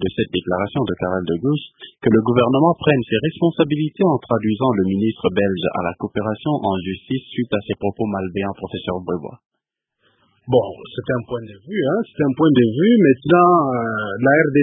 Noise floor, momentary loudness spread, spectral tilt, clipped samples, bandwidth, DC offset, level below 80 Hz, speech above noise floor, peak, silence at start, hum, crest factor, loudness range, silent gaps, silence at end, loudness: -78 dBFS; 11 LU; -12 dB/octave; under 0.1%; 3.9 kHz; under 0.1%; -48 dBFS; 60 dB; 0 dBFS; 0 s; none; 18 dB; 8 LU; 9.46-9.50 s; 0 s; -19 LUFS